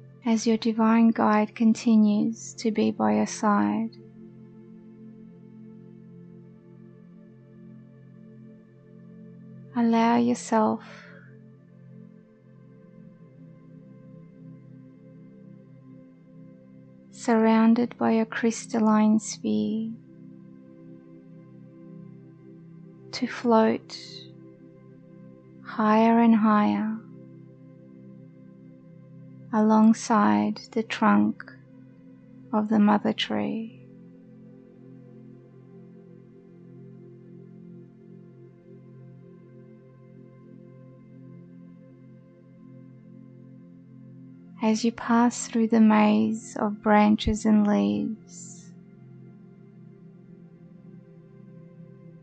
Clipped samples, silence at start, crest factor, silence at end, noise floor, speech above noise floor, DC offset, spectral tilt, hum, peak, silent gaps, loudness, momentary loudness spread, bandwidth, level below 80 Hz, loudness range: under 0.1%; 0.25 s; 20 dB; 0.4 s; -52 dBFS; 30 dB; under 0.1%; -6 dB/octave; none; -8 dBFS; none; -23 LUFS; 27 LU; 8.8 kHz; -56 dBFS; 12 LU